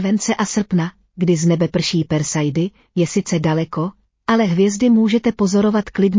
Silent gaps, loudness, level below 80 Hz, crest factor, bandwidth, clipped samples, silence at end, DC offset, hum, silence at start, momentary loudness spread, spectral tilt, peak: none; -18 LUFS; -50 dBFS; 12 dB; 7.6 kHz; under 0.1%; 0 s; under 0.1%; none; 0 s; 8 LU; -5.5 dB/octave; -4 dBFS